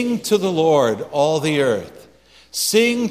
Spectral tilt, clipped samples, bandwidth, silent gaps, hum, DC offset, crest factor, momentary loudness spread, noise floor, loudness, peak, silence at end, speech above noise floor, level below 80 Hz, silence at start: -4 dB/octave; under 0.1%; 15.5 kHz; none; none; under 0.1%; 14 dB; 6 LU; -49 dBFS; -18 LUFS; -4 dBFS; 0 s; 32 dB; -58 dBFS; 0 s